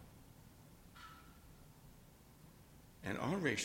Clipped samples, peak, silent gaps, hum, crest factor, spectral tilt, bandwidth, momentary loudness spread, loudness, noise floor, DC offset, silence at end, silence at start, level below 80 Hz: under 0.1%; -22 dBFS; none; none; 24 dB; -4.5 dB/octave; 16.5 kHz; 23 LU; -43 LUFS; -62 dBFS; under 0.1%; 0 s; 0 s; -66 dBFS